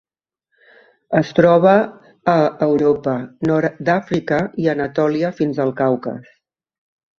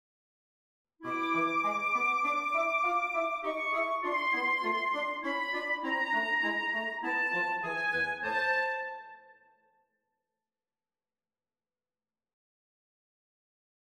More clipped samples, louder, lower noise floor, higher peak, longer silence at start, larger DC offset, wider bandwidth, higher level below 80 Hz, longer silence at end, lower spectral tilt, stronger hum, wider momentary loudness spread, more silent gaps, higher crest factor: neither; first, -17 LUFS vs -30 LUFS; second, -76 dBFS vs under -90 dBFS; first, 0 dBFS vs -18 dBFS; about the same, 1.1 s vs 1 s; neither; second, 7.2 kHz vs 15.5 kHz; first, -56 dBFS vs -76 dBFS; second, 0.95 s vs 4.55 s; first, -8 dB/octave vs -3.5 dB/octave; neither; first, 10 LU vs 5 LU; neither; about the same, 18 dB vs 16 dB